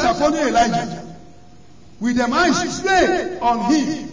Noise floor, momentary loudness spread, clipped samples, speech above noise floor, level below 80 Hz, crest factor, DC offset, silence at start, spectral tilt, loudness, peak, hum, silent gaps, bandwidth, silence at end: -47 dBFS; 9 LU; under 0.1%; 29 dB; -44 dBFS; 16 dB; 0.8%; 0 s; -4 dB/octave; -18 LUFS; -4 dBFS; none; none; 7.6 kHz; 0 s